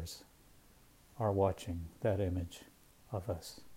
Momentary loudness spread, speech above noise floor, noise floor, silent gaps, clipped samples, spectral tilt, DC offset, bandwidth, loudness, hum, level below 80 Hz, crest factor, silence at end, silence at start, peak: 17 LU; 27 dB; -63 dBFS; none; under 0.1%; -6.5 dB/octave; under 0.1%; 16 kHz; -38 LUFS; none; -58 dBFS; 22 dB; 0 s; 0 s; -18 dBFS